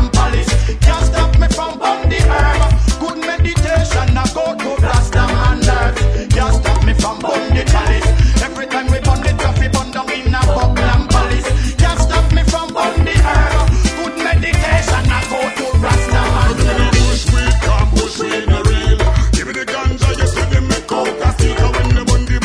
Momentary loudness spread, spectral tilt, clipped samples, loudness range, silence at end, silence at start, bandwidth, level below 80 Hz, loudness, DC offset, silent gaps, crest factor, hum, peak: 4 LU; -5 dB/octave; under 0.1%; 1 LU; 0 s; 0 s; 11 kHz; -14 dBFS; -14 LUFS; under 0.1%; none; 12 dB; none; 0 dBFS